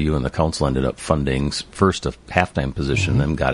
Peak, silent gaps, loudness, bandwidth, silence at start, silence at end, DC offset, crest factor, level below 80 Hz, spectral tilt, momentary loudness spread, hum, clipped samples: 0 dBFS; none; -21 LUFS; 11.5 kHz; 0 s; 0 s; under 0.1%; 20 dB; -30 dBFS; -6 dB/octave; 4 LU; none; under 0.1%